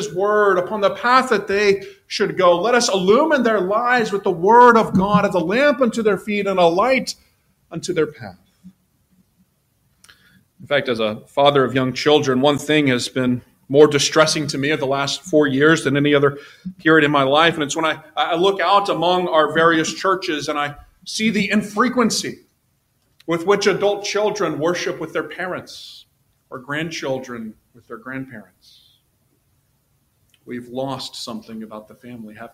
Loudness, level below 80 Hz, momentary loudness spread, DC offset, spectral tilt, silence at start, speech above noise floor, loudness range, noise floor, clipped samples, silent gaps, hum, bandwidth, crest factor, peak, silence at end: -17 LUFS; -56 dBFS; 18 LU; under 0.1%; -4.5 dB/octave; 0 s; 47 dB; 15 LU; -65 dBFS; under 0.1%; none; none; 15.5 kHz; 18 dB; 0 dBFS; 0.05 s